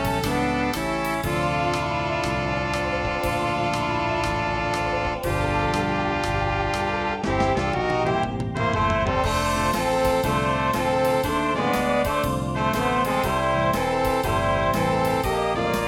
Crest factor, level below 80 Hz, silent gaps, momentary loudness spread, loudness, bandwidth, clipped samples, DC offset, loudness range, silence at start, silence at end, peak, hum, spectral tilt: 14 dB; -36 dBFS; none; 3 LU; -23 LUFS; 19 kHz; under 0.1%; under 0.1%; 2 LU; 0 s; 0 s; -8 dBFS; none; -5.5 dB/octave